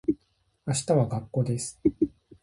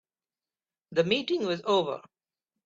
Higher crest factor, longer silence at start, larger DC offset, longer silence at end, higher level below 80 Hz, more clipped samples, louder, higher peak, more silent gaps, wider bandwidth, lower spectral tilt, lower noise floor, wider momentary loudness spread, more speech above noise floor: about the same, 18 dB vs 20 dB; second, 0.1 s vs 0.9 s; neither; second, 0.35 s vs 0.65 s; first, -54 dBFS vs -74 dBFS; neither; about the same, -28 LUFS vs -28 LUFS; about the same, -10 dBFS vs -10 dBFS; neither; first, 11.5 kHz vs 7.8 kHz; about the same, -6.5 dB/octave vs -5.5 dB/octave; second, -70 dBFS vs under -90 dBFS; about the same, 7 LU vs 8 LU; second, 44 dB vs over 63 dB